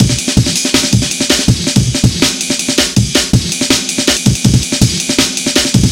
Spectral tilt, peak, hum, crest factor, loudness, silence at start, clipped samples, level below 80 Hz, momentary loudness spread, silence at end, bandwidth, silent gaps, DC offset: -3.5 dB/octave; 0 dBFS; none; 12 dB; -11 LUFS; 0 s; 0.5%; -26 dBFS; 2 LU; 0 s; 17 kHz; none; under 0.1%